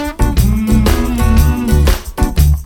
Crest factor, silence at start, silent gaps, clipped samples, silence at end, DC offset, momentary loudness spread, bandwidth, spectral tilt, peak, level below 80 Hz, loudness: 12 dB; 0 s; none; under 0.1%; 0 s; under 0.1%; 4 LU; 18.5 kHz; -6 dB/octave; 0 dBFS; -14 dBFS; -13 LUFS